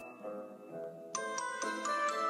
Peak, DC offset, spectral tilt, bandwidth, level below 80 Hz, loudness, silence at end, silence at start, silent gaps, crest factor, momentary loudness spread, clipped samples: -20 dBFS; under 0.1%; -1.5 dB/octave; 15.5 kHz; under -90 dBFS; -39 LUFS; 0 s; 0 s; none; 18 dB; 12 LU; under 0.1%